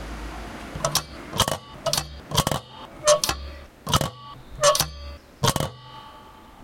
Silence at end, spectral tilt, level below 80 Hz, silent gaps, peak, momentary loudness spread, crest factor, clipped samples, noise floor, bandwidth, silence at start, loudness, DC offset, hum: 0 s; -3 dB/octave; -42 dBFS; none; -4 dBFS; 22 LU; 22 dB; under 0.1%; -46 dBFS; 17 kHz; 0 s; -24 LUFS; under 0.1%; none